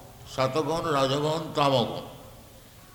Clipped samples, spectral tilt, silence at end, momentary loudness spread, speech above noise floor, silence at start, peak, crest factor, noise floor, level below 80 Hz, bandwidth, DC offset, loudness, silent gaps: under 0.1%; -5 dB/octave; 0.1 s; 14 LU; 24 dB; 0 s; -8 dBFS; 20 dB; -50 dBFS; -54 dBFS; 19.5 kHz; under 0.1%; -26 LUFS; none